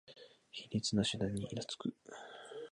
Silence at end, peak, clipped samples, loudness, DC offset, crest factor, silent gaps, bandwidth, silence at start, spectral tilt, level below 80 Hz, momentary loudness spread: 0.05 s; -20 dBFS; under 0.1%; -38 LUFS; under 0.1%; 20 dB; none; 11 kHz; 0.05 s; -4.5 dB/octave; -64 dBFS; 18 LU